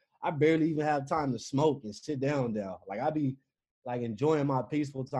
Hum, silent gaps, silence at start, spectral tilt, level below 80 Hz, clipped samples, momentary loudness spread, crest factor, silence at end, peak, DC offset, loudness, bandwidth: none; 3.71-3.82 s; 0.2 s; -7 dB/octave; -66 dBFS; under 0.1%; 11 LU; 18 dB; 0 s; -14 dBFS; under 0.1%; -31 LUFS; 10.5 kHz